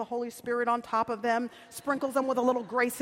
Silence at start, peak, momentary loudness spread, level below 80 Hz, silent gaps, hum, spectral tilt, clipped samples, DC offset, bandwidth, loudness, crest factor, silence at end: 0 s; -14 dBFS; 7 LU; -72 dBFS; none; none; -4 dB/octave; under 0.1%; under 0.1%; 16.5 kHz; -30 LUFS; 16 dB; 0 s